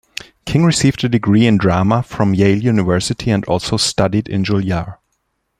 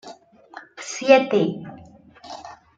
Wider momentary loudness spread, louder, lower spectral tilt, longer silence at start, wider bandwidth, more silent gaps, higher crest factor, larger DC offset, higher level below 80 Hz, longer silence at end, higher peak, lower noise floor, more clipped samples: second, 7 LU vs 25 LU; first, -15 LUFS vs -19 LUFS; about the same, -5.5 dB/octave vs -4.5 dB/octave; first, 0.45 s vs 0.05 s; first, 15 kHz vs 8.6 kHz; neither; second, 14 dB vs 22 dB; neither; first, -42 dBFS vs -66 dBFS; first, 0.65 s vs 0.25 s; about the same, 0 dBFS vs -2 dBFS; first, -68 dBFS vs -47 dBFS; neither